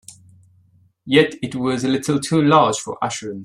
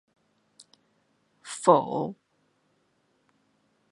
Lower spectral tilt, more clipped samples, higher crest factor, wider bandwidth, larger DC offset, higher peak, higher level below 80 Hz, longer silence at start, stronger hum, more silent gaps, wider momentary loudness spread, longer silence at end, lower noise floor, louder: about the same, -5 dB/octave vs -5.5 dB/octave; neither; second, 18 dB vs 28 dB; first, 13 kHz vs 11.5 kHz; neither; about the same, -2 dBFS vs -4 dBFS; first, -60 dBFS vs -80 dBFS; second, 0.1 s vs 1.45 s; neither; neither; second, 10 LU vs 20 LU; second, 0 s vs 1.8 s; second, -56 dBFS vs -71 dBFS; first, -18 LUFS vs -25 LUFS